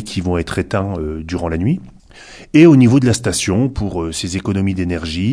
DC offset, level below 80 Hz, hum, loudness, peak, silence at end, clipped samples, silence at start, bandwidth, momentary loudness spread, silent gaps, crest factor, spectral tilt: under 0.1%; -36 dBFS; none; -16 LUFS; 0 dBFS; 0 s; under 0.1%; 0 s; 11 kHz; 13 LU; none; 16 dB; -6 dB/octave